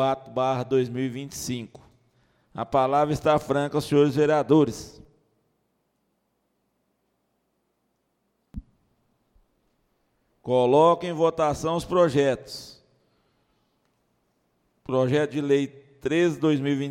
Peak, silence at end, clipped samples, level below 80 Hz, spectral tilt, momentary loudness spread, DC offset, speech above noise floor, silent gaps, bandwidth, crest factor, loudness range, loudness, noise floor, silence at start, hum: -6 dBFS; 0 s; under 0.1%; -56 dBFS; -6.5 dB/octave; 19 LU; under 0.1%; 51 dB; none; 16 kHz; 20 dB; 6 LU; -23 LUFS; -74 dBFS; 0 s; none